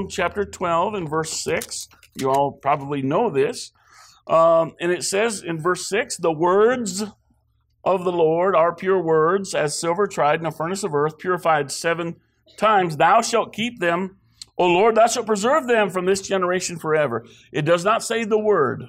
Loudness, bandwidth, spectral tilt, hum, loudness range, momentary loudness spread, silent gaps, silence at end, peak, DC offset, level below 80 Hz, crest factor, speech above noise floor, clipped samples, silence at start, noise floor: -20 LUFS; 16 kHz; -4 dB/octave; none; 3 LU; 9 LU; none; 0 s; -6 dBFS; under 0.1%; -60 dBFS; 14 dB; 45 dB; under 0.1%; 0 s; -65 dBFS